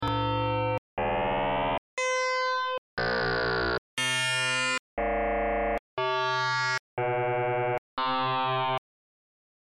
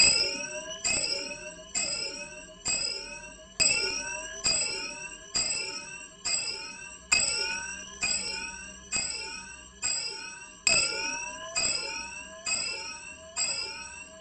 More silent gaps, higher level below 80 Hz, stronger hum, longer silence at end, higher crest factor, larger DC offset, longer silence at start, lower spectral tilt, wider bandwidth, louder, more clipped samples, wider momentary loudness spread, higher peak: first, 0.78-0.97 s, 1.78-1.97 s, 2.78-2.97 s, 3.78-3.97 s, 4.79-4.97 s, 5.79-5.97 s, 6.79-6.97 s, 7.78-7.97 s vs none; first, -48 dBFS vs -56 dBFS; neither; first, 0.95 s vs 0 s; second, 4 dB vs 24 dB; neither; about the same, 0 s vs 0 s; first, -4 dB/octave vs 0.5 dB/octave; first, 13.5 kHz vs 9.4 kHz; about the same, -28 LUFS vs -29 LUFS; neither; second, 5 LU vs 15 LU; second, -24 dBFS vs -8 dBFS